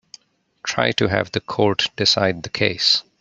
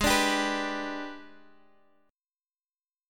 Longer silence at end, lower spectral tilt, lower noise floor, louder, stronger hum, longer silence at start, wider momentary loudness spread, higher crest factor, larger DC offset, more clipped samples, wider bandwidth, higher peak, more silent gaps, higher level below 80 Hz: second, 0.2 s vs 1.75 s; about the same, -3.5 dB/octave vs -2.5 dB/octave; second, -48 dBFS vs under -90 dBFS; first, -19 LUFS vs -28 LUFS; neither; first, 0.65 s vs 0 s; second, 7 LU vs 18 LU; about the same, 20 dB vs 22 dB; neither; neither; second, 8.4 kHz vs 17.5 kHz; first, -2 dBFS vs -10 dBFS; neither; second, -56 dBFS vs -50 dBFS